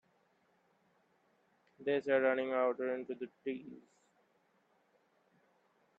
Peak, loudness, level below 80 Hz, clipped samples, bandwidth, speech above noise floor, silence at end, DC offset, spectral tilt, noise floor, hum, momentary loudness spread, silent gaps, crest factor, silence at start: -20 dBFS; -36 LUFS; -88 dBFS; under 0.1%; 7.6 kHz; 39 dB; 2.2 s; under 0.1%; -6.5 dB/octave; -75 dBFS; none; 13 LU; none; 20 dB; 1.8 s